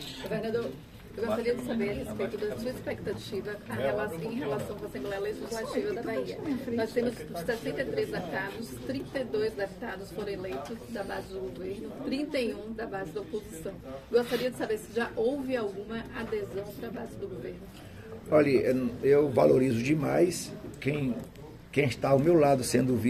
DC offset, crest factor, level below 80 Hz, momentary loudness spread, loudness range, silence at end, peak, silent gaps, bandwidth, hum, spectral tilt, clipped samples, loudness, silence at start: under 0.1%; 20 dB; -54 dBFS; 14 LU; 9 LU; 0 s; -10 dBFS; none; 14.5 kHz; none; -6 dB/octave; under 0.1%; -31 LUFS; 0 s